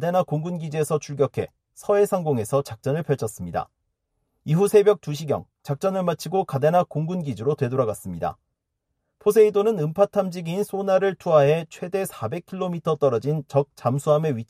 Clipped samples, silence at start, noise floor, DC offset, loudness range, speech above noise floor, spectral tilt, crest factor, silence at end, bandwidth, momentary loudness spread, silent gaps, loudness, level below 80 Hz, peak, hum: under 0.1%; 0 s; -78 dBFS; under 0.1%; 4 LU; 56 dB; -7 dB/octave; 18 dB; 0.05 s; 15 kHz; 12 LU; none; -23 LUFS; -60 dBFS; -4 dBFS; none